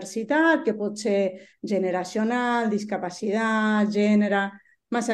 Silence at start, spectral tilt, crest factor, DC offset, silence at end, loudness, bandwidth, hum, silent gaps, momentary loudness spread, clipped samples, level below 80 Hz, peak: 0 s; -5.5 dB/octave; 16 dB; under 0.1%; 0 s; -24 LUFS; 11.5 kHz; none; none; 8 LU; under 0.1%; -72 dBFS; -8 dBFS